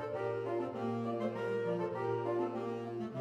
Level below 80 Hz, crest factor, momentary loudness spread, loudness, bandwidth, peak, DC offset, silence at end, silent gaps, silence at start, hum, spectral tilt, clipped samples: -78 dBFS; 12 dB; 4 LU; -37 LUFS; 9.4 kHz; -24 dBFS; under 0.1%; 0 s; none; 0 s; none; -8 dB/octave; under 0.1%